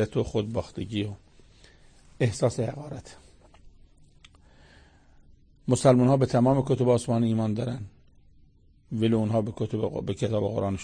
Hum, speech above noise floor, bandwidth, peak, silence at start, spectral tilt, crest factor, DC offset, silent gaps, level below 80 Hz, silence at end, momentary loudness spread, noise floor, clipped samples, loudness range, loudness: none; 32 dB; 9.8 kHz; -8 dBFS; 0 s; -7 dB/octave; 20 dB; under 0.1%; none; -52 dBFS; 0 s; 16 LU; -57 dBFS; under 0.1%; 9 LU; -26 LUFS